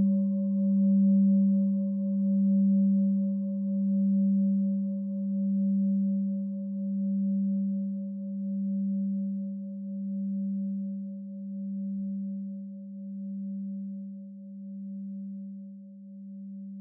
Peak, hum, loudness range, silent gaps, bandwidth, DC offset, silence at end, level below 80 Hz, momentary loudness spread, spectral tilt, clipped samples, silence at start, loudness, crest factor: -18 dBFS; none; 14 LU; none; 1.1 kHz; under 0.1%; 0 s; under -90 dBFS; 17 LU; -16.5 dB/octave; under 0.1%; 0 s; -29 LUFS; 10 dB